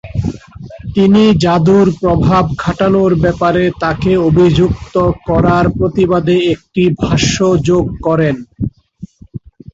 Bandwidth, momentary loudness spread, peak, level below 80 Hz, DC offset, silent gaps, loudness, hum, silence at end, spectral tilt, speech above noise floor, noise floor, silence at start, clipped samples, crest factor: 8 kHz; 13 LU; 0 dBFS; -30 dBFS; under 0.1%; none; -12 LUFS; none; 0.35 s; -6.5 dB/octave; 23 dB; -34 dBFS; 0.05 s; under 0.1%; 12 dB